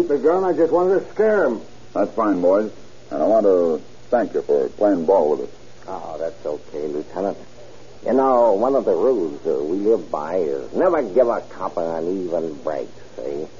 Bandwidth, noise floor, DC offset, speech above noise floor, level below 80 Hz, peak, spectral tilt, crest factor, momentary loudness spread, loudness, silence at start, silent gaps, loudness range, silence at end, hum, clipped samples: 7.2 kHz; -43 dBFS; 1%; 24 dB; -56 dBFS; -4 dBFS; -6 dB/octave; 16 dB; 13 LU; -20 LUFS; 0 s; none; 4 LU; 0.1 s; none; under 0.1%